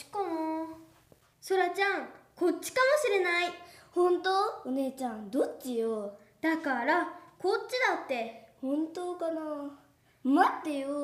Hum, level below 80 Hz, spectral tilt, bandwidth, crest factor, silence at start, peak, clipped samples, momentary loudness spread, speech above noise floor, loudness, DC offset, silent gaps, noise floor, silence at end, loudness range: none; -76 dBFS; -3 dB/octave; 15.5 kHz; 22 dB; 0 s; -10 dBFS; under 0.1%; 12 LU; 33 dB; -31 LUFS; under 0.1%; none; -63 dBFS; 0 s; 3 LU